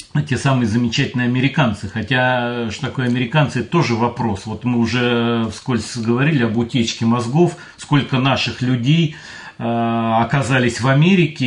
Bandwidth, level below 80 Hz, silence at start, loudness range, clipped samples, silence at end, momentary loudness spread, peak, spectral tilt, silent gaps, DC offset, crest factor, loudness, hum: 10.5 kHz; -52 dBFS; 0 s; 1 LU; under 0.1%; 0 s; 7 LU; -2 dBFS; -6 dB/octave; none; under 0.1%; 14 dB; -17 LUFS; none